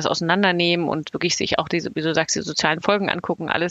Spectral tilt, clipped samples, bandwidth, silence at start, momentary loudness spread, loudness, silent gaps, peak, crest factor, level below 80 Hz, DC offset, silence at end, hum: -3.5 dB/octave; under 0.1%; 8.6 kHz; 0 s; 6 LU; -21 LUFS; none; 0 dBFS; 20 dB; -56 dBFS; under 0.1%; 0 s; none